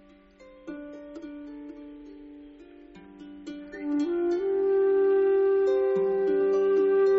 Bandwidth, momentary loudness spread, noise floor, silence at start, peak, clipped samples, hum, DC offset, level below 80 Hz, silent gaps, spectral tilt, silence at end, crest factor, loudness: 6.2 kHz; 23 LU; -53 dBFS; 0.65 s; -16 dBFS; under 0.1%; none; under 0.1%; -64 dBFS; none; -5.5 dB/octave; 0 s; 10 dB; -24 LUFS